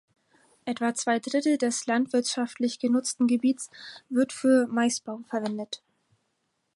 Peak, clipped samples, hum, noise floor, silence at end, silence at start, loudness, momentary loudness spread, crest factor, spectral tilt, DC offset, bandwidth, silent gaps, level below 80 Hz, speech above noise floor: -12 dBFS; under 0.1%; none; -76 dBFS; 1 s; 0.65 s; -26 LUFS; 13 LU; 16 dB; -3.5 dB/octave; under 0.1%; 11.5 kHz; none; -80 dBFS; 50 dB